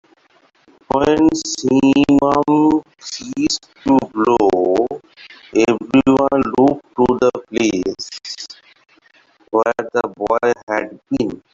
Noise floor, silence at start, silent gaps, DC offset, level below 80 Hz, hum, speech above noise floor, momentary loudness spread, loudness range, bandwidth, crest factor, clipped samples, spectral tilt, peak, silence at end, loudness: -55 dBFS; 0.95 s; 10.63-10.67 s; under 0.1%; -48 dBFS; none; 40 dB; 12 LU; 6 LU; 7.8 kHz; 14 dB; under 0.1%; -5 dB/octave; -2 dBFS; 0.15 s; -16 LUFS